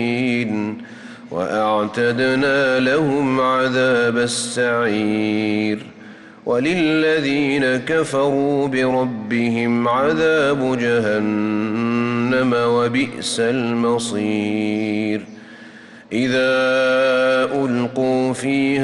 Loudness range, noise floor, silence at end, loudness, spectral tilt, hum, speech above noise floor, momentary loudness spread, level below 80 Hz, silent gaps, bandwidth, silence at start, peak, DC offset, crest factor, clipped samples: 2 LU; -40 dBFS; 0 s; -18 LUFS; -5 dB/octave; none; 23 dB; 6 LU; -58 dBFS; none; 12 kHz; 0 s; -8 dBFS; under 0.1%; 10 dB; under 0.1%